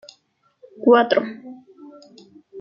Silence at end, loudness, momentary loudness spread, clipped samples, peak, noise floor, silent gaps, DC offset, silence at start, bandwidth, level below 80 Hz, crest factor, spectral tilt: 0 s; -17 LUFS; 24 LU; under 0.1%; -2 dBFS; -64 dBFS; none; under 0.1%; 0.8 s; 7.2 kHz; -72 dBFS; 20 dB; -5.5 dB/octave